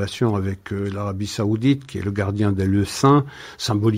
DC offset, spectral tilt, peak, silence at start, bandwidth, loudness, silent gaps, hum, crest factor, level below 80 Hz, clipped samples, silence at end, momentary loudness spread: under 0.1%; -6.5 dB/octave; -2 dBFS; 0 s; 15.5 kHz; -21 LUFS; none; none; 18 dB; -50 dBFS; under 0.1%; 0 s; 10 LU